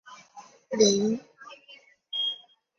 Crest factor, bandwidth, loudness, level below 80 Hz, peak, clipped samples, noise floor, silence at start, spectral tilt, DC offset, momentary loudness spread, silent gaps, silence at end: 22 dB; 7.6 kHz; -26 LUFS; -70 dBFS; -8 dBFS; under 0.1%; -55 dBFS; 0.05 s; -3.5 dB/octave; under 0.1%; 26 LU; none; 0.45 s